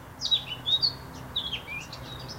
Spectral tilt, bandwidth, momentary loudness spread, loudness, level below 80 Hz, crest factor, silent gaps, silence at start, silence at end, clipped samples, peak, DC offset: -2.5 dB/octave; 16 kHz; 15 LU; -27 LUFS; -52 dBFS; 18 dB; none; 0 s; 0 s; under 0.1%; -14 dBFS; under 0.1%